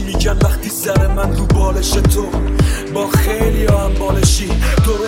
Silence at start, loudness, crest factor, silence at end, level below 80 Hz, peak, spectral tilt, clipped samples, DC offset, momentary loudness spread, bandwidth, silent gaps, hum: 0 s; -15 LUFS; 14 dB; 0 s; -16 dBFS; 0 dBFS; -5 dB/octave; under 0.1%; under 0.1%; 3 LU; 16.5 kHz; none; none